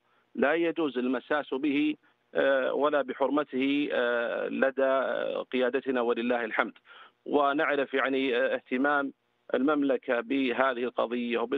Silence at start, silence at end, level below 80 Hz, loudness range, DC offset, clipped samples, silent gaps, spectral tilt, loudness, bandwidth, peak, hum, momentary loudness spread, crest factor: 0.35 s; 0 s; -76 dBFS; 1 LU; under 0.1%; under 0.1%; none; -7 dB/octave; -28 LUFS; 4.7 kHz; -8 dBFS; none; 5 LU; 20 dB